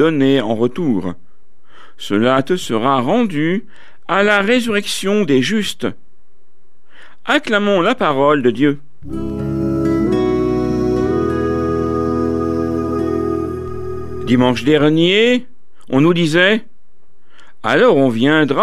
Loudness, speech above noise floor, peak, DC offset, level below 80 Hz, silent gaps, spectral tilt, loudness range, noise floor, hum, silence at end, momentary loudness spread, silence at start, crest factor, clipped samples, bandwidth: -16 LUFS; 46 dB; 0 dBFS; 4%; -40 dBFS; none; -6 dB/octave; 4 LU; -60 dBFS; none; 0 s; 12 LU; 0 s; 16 dB; under 0.1%; 14.5 kHz